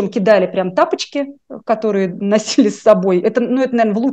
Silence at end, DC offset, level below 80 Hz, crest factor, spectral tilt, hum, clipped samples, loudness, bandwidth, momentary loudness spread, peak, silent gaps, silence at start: 0 s; under 0.1%; -62 dBFS; 14 dB; -5.5 dB/octave; none; under 0.1%; -15 LUFS; 8.8 kHz; 8 LU; 0 dBFS; none; 0 s